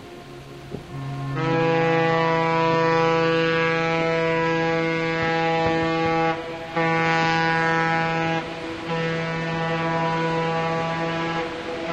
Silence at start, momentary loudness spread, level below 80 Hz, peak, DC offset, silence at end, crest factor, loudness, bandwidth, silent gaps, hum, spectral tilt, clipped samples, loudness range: 0 s; 10 LU; -52 dBFS; -6 dBFS; under 0.1%; 0 s; 16 dB; -22 LUFS; 8.6 kHz; none; none; -6 dB/octave; under 0.1%; 4 LU